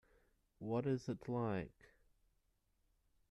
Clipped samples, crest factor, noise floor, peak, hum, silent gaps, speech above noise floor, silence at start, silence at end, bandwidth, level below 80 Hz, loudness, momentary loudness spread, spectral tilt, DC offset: under 0.1%; 18 dB; -81 dBFS; -28 dBFS; none; none; 39 dB; 0.6 s; 1.6 s; 11.5 kHz; -72 dBFS; -42 LUFS; 11 LU; -8 dB/octave; under 0.1%